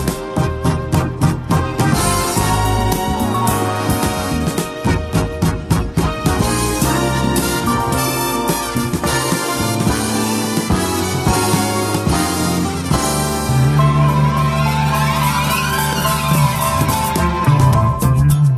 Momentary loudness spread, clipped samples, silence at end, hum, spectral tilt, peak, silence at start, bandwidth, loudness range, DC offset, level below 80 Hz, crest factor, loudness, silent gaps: 5 LU; under 0.1%; 0 s; none; -5 dB/octave; -2 dBFS; 0 s; 16 kHz; 3 LU; under 0.1%; -28 dBFS; 14 dB; -16 LUFS; none